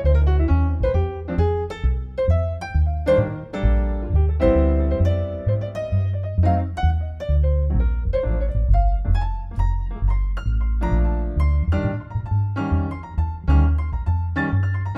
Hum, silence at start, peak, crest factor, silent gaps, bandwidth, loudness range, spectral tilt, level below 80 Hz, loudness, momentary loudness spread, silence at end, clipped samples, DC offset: none; 0 s; -4 dBFS; 16 dB; none; 5.8 kHz; 2 LU; -9.5 dB/octave; -22 dBFS; -22 LUFS; 6 LU; 0 s; under 0.1%; under 0.1%